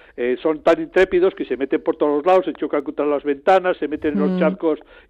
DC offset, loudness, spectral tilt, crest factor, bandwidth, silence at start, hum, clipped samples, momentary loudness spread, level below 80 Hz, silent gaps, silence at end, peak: under 0.1%; -19 LUFS; -7.5 dB/octave; 14 dB; 8 kHz; 0.15 s; none; under 0.1%; 7 LU; -52 dBFS; none; 0.3 s; -6 dBFS